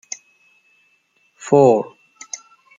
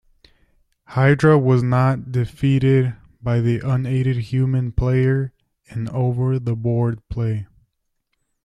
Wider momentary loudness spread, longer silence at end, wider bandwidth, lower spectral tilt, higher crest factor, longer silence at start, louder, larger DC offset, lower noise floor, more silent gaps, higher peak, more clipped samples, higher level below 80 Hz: first, 21 LU vs 11 LU; second, 0.4 s vs 1 s; about the same, 9.2 kHz vs 8.8 kHz; second, -6 dB/octave vs -9 dB/octave; about the same, 18 dB vs 18 dB; first, 1.45 s vs 0.9 s; first, -15 LUFS vs -20 LUFS; neither; second, -62 dBFS vs -72 dBFS; neither; about the same, -2 dBFS vs -2 dBFS; neither; second, -68 dBFS vs -40 dBFS